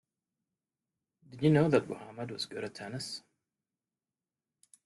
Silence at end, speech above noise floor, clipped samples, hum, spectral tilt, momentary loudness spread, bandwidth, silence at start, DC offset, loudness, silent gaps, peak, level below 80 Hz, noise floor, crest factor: 1.65 s; over 59 dB; under 0.1%; none; -6.5 dB/octave; 16 LU; 12 kHz; 1.3 s; under 0.1%; -32 LUFS; none; -12 dBFS; -72 dBFS; under -90 dBFS; 24 dB